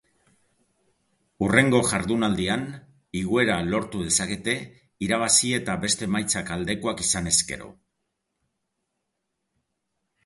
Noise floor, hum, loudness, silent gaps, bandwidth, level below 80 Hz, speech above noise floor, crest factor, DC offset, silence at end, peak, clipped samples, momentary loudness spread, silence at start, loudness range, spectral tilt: -79 dBFS; none; -23 LUFS; none; 12 kHz; -50 dBFS; 55 dB; 26 dB; under 0.1%; 2.55 s; -2 dBFS; under 0.1%; 13 LU; 1.4 s; 5 LU; -3 dB/octave